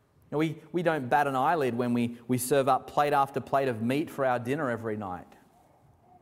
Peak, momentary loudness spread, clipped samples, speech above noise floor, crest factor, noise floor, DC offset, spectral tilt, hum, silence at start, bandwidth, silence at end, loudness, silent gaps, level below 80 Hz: -10 dBFS; 8 LU; under 0.1%; 33 dB; 18 dB; -61 dBFS; under 0.1%; -5.5 dB/octave; none; 0.3 s; 16 kHz; 1 s; -28 LUFS; none; -66 dBFS